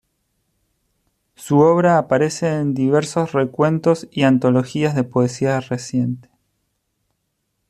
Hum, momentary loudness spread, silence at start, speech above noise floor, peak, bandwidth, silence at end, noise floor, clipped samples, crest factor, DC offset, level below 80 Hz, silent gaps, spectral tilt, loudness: none; 8 LU; 1.4 s; 55 dB; -2 dBFS; 13 kHz; 1.5 s; -72 dBFS; under 0.1%; 16 dB; under 0.1%; -58 dBFS; none; -6.5 dB/octave; -18 LUFS